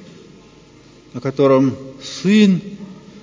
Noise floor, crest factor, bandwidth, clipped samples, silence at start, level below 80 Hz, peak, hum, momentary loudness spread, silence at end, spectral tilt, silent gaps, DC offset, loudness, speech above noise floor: -45 dBFS; 16 dB; 7.6 kHz; under 0.1%; 1.15 s; -56 dBFS; -2 dBFS; none; 22 LU; 0.05 s; -6.5 dB/octave; none; under 0.1%; -16 LUFS; 30 dB